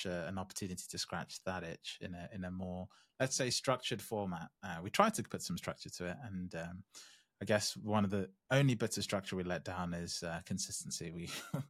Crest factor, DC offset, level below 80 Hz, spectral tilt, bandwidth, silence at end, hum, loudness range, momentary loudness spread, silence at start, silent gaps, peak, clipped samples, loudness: 26 dB; under 0.1%; -72 dBFS; -4 dB/octave; 16 kHz; 0 s; none; 3 LU; 13 LU; 0 s; none; -12 dBFS; under 0.1%; -39 LUFS